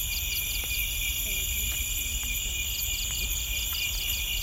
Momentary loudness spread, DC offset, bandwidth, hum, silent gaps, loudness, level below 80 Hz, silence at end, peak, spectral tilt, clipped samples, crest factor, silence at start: 1 LU; under 0.1%; 16 kHz; none; none; -28 LUFS; -36 dBFS; 0 s; -14 dBFS; 0 dB/octave; under 0.1%; 14 dB; 0 s